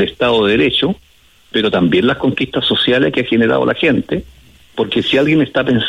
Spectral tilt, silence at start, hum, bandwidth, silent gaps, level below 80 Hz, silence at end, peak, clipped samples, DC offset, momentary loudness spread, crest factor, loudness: -6.5 dB/octave; 0 s; none; 11.5 kHz; none; -44 dBFS; 0 s; -2 dBFS; under 0.1%; under 0.1%; 8 LU; 12 dB; -14 LUFS